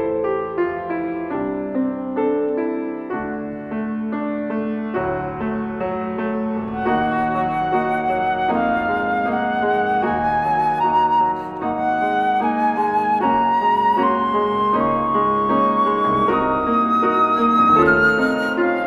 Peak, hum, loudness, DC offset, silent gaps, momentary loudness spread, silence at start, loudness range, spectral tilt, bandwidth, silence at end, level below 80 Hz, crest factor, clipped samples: -2 dBFS; none; -19 LUFS; under 0.1%; none; 8 LU; 0 s; 7 LU; -7.5 dB/octave; 12 kHz; 0 s; -48 dBFS; 16 dB; under 0.1%